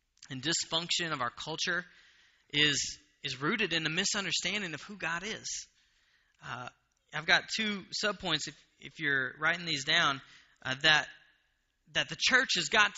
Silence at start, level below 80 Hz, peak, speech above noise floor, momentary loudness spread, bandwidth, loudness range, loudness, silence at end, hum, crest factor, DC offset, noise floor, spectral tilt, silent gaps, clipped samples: 0.2 s; -66 dBFS; -8 dBFS; 44 dB; 16 LU; 8 kHz; 5 LU; -30 LUFS; 0 s; none; 24 dB; under 0.1%; -76 dBFS; -0.5 dB/octave; none; under 0.1%